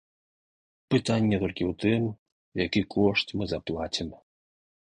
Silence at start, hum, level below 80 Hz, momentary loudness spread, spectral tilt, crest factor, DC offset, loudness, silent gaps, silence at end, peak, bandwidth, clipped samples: 0.9 s; none; -52 dBFS; 8 LU; -6 dB/octave; 20 dB; under 0.1%; -27 LUFS; 2.18-2.26 s, 2.32-2.52 s; 0.8 s; -10 dBFS; 10.5 kHz; under 0.1%